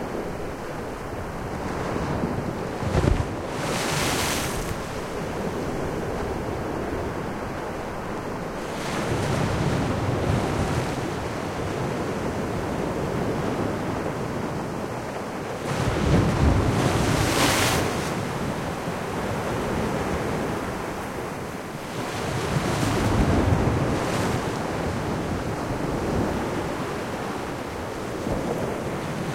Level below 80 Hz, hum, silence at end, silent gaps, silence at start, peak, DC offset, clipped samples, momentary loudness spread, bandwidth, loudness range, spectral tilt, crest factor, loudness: -38 dBFS; none; 0 s; none; 0 s; -6 dBFS; under 0.1%; under 0.1%; 9 LU; 16.5 kHz; 6 LU; -5.5 dB/octave; 18 dB; -26 LUFS